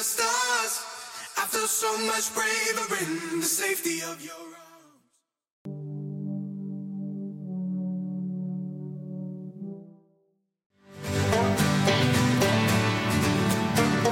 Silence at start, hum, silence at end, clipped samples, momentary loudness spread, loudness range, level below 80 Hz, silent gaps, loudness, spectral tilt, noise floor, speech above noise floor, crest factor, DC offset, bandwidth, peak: 0 s; none; 0 s; under 0.1%; 16 LU; 12 LU; -56 dBFS; 5.52-5.65 s, 10.66-10.70 s; -26 LUFS; -4 dB/octave; -73 dBFS; 45 dB; 18 dB; under 0.1%; 16.5 kHz; -10 dBFS